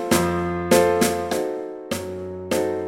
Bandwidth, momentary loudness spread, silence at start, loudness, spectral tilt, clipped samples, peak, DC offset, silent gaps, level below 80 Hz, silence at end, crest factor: 16.5 kHz; 13 LU; 0 s; -22 LUFS; -4.5 dB/octave; under 0.1%; -4 dBFS; under 0.1%; none; -48 dBFS; 0 s; 18 dB